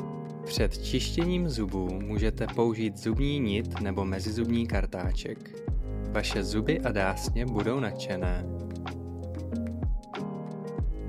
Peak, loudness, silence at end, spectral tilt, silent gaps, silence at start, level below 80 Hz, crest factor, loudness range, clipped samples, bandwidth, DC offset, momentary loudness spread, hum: -12 dBFS; -31 LUFS; 0 s; -6 dB/octave; none; 0 s; -36 dBFS; 18 dB; 3 LU; under 0.1%; 15 kHz; under 0.1%; 9 LU; none